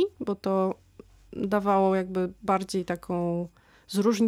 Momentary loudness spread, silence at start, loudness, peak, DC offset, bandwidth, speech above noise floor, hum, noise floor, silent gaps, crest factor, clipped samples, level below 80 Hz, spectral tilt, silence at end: 11 LU; 0 s; -28 LUFS; -12 dBFS; under 0.1%; 15 kHz; 24 dB; none; -50 dBFS; none; 16 dB; under 0.1%; -60 dBFS; -6.5 dB/octave; 0 s